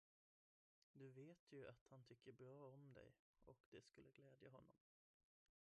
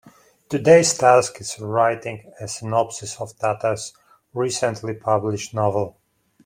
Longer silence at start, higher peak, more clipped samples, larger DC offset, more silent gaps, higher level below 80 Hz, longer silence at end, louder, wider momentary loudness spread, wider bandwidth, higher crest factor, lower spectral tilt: first, 0.95 s vs 0.05 s; second, -48 dBFS vs -2 dBFS; neither; neither; first, 1.39-1.47 s, 1.81-1.86 s, 3.19-3.34 s, 3.60-3.72 s vs none; second, -90 dBFS vs -60 dBFS; first, 0.85 s vs 0.55 s; second, -66 LUFS vs -20 LUFS; second, 6 LU vs 17 LU; second, 8 kHz vs 16 kHz; about the same, 18 dB vs 20 dB; first, -6 dB/octave vs -4.5 dB/octave